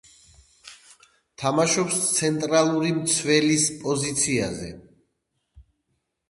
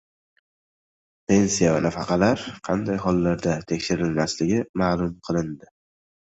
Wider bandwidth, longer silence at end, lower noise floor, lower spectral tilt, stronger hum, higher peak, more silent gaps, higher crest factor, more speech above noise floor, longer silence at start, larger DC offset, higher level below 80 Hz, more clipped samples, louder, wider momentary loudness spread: first, 12 kHz vs 8.2 kHz; about the same, 0.7 s vs 0.75 s; second, -76 dBFS vs under -90 dBFS; second, -3.5 dB/octave vs -5.5 dB/octave; neither; about the same, -4 dBFS vs -4 dBFS; second, none vs 4.69-4.74 s; about the same, 20 dB vs 20 dB; second, 53 dB vs over 68 dB; second, 0.65 s vs 1.3 s; neither; second, -58 dBFS vs -48 dBFS; neither; about the same, -22 LUFS vs -23 LUFS; about the same, 8 LU vs 7 LU